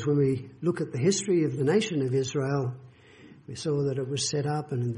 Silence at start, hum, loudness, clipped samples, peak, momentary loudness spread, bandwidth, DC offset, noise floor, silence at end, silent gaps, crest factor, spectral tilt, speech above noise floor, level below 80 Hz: 0 s; none; -28 LUFS; under 0.1%; -12 dBFS; 6 LU; 11 kHz; under 0.1%; -52 dBFS; 0 s; none; 16 dB; -5.5 dB/octave; 25 dB; -62 dBFS